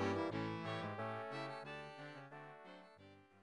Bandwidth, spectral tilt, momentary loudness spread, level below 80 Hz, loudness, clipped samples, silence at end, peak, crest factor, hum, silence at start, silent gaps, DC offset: 11 kHz; -6.5 dB/octave; 18 LU; -76 dBFS; -46 LUFS; under 0.1%; 0 s; -28 dBFS; 18 dB; none; 0 s; none; under 0.1%